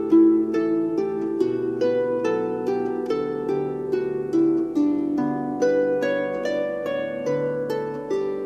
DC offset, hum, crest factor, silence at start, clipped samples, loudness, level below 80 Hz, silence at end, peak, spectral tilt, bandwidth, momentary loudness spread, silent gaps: under 0.1%; none; 14 dB; 0 s; under 0.1%; -23 LUFS; -62 dBFS; 0 s; -8 dBFS; -7 dB/octave; 8 kHz; 5 LU; none